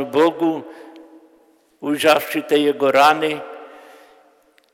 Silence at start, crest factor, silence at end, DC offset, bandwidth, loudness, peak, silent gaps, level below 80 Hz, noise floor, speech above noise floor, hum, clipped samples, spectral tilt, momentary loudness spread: 0 s; 16 dB; 1.05 s; under 0.1%; 16.5 kHz; -17 LUFS; -4 dBFS; none; -68 dBFS; -56 dBFS; 39 dB; none; under 0.1%; -4 dB/octave; 18 LU